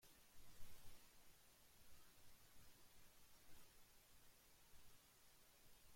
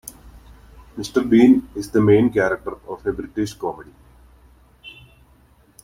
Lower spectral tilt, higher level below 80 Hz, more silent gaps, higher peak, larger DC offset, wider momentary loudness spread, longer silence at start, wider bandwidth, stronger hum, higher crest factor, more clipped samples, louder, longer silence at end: second, -2 dB/octave vs -7 dB/octave; second, -74 dBFS vs -48 dBFS; neither; second, -42 dBFS vs -2 dBFS; neither; second, 3 LU vs 25 LU; second, 0 s vs 0.25 s; about the same, 16.5 kHz vs 16.5 kHz; neither; about the same, 18 dB vs 18 dB; neither; second, -69 LUFS vs -19 LUFS; second, 0 s vs 0.9 s